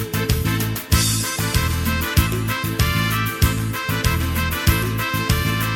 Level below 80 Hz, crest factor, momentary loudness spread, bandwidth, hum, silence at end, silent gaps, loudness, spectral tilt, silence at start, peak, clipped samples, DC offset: -28 dBFS; 18 dB; 3 LU; 18 kHz; none; 0 s; none; -20 LUFS; -4 dB/octave; 0 s; -2 dBFS; under 0.1%; under 0.1%